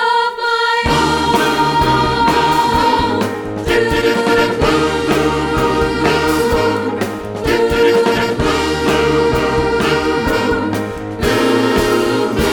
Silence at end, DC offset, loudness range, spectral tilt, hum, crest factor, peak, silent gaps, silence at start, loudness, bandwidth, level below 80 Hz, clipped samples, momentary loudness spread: 0 s; under 0.1%; 2 LU; -5 dB/octave; none; 14 dB; 0 dBFS; none; 0 s; -14 LUFS; 20 kHz; -30 dBFS; under 0.1%; 5 LU